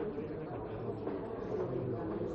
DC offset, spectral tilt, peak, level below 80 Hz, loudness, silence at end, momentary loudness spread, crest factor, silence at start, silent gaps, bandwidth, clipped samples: under 0.1%; -8.5 dB/octave; -24 dBFS; -58 dBFS; -39 LUFS; 0 s; 4 LU; 14 dB; 0 s; none; 6.8 kHz; under 0.1%